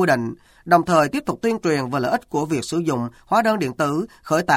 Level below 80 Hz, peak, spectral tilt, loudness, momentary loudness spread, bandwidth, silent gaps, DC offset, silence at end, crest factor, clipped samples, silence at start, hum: -54 dBFS; -2 dBFS; -5.5 dB/octave; -21 LUFS; 6 LU; 16.5 kHz; none; under 0.1%; 0 s; 18 dB; under 0.1%; 0 s; none